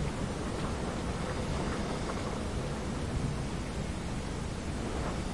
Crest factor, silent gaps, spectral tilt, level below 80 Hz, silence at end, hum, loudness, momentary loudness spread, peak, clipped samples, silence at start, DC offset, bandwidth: 14 dB; none; -5.5 dB/octave; -40 dBFS; 0 s; none; -36 LUFS; 3 LU; -20 dBFS; under 0.1%; 0 s; 0.2%; 11.5 kHz